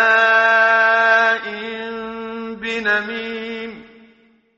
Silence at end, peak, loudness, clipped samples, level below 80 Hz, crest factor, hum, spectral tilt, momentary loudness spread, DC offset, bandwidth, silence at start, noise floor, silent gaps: 0.75 s; -2 dBFS; -16 LUFS; under 0.1%; -62 dBFS; 16 dB; none; 0.5 dB/octave; 16 LU; under 0.1%; 7.6 kHz; 0 s; -54 dBFS; none